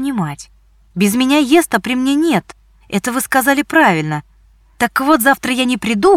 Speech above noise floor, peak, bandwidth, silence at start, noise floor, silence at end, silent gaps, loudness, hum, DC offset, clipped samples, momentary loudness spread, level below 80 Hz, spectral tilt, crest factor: 35 dB; 0 dBFS; 18 kHz; 0 s; -49 dBFS; 0 s; none; -14 LUFS; none; under 0.1%; under 0.1%; 11 LU; -48 dBFS; -4 dB/octave; 14 dB